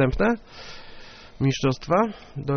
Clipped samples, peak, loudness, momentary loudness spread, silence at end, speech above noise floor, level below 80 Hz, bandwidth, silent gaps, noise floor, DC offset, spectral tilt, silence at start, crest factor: under 0.1%; -6 dBFS; -24 LUFS; 22 LU; 0 s; 19 dB; -40 dBFS; 6.6 kHz; none; -43 dBFS; under 0.1%; -6 dB/octave; 0 s; 18 dB